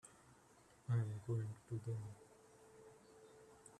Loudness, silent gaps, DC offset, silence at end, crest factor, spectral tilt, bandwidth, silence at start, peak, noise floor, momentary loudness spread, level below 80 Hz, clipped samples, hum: -45 LUFS; none; under 0.1%; 0 s; 18 dB; -7.5 dB/octave; 11.5 kHz; 0.05 s; -30 dBFS; -68 dBFS; 25 LU; -76 dBFS; under 0.1%; none